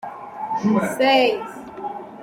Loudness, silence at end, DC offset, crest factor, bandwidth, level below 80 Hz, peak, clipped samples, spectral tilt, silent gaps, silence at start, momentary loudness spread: -19 LUFS; 0 s; under 0.1%; 18 dB; 16 kHz; -64 dBFS; -4 dBFS; under 0.1%; -5 dB/octave; none; 0.05 s; 17 LU